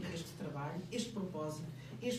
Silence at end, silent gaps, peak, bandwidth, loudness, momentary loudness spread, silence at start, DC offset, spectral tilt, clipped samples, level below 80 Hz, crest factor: 0 s; none; -26 dBFS; 15.5 kHz; -43 LUFS; 4 LU; 0 s; under 0.1%; -5.5 dB/octave; under 0.1%; -68 dBFS; 16 dB